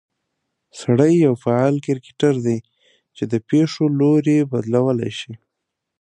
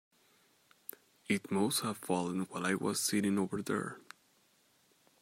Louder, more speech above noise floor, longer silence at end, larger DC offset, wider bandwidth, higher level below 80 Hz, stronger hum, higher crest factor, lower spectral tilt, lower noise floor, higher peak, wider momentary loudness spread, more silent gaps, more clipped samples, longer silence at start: first, -18 LUFS vs -34 LUFS; first, 62 dB vs 36 dB; second, 0.65 s vs 1.2 s; neither; second, 9.6 kHz vs 16 kHz; first, -62 dBFS vs -80 dBFS; neither; about the same, 18 dB vs 18 dB; first, -7.5 dB/octave vs -4 dB/octave; first, -80 dBFS vs -70 dBFS; first, -2 dBFS vs -18 dBFS; second, 12 LU vs 18 LU; neither; neither; second, 0.75 s vs 1.3 s